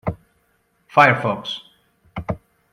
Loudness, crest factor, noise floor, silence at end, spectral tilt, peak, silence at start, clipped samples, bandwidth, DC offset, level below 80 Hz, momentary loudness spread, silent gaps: -19 LUFS; 22 dB; -64 dBFS; 0.35 s; -6 dB/octave; 0 dBFS; 0.05 s; under 0.1%; 15 kHz; under 0.1%; -48 dBFS; 20 LU; none